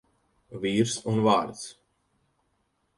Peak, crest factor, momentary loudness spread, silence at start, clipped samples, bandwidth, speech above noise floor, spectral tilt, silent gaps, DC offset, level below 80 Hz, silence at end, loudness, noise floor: -8 dBFS; 22 dB; 18 LU; 0.5 s; under 0.1%; 11.5 kHz; 48 dB; -5 dB/octave; none; under 0.1%; -64 dBFS; 1.25 s; -26 LUFS; -73 dBFS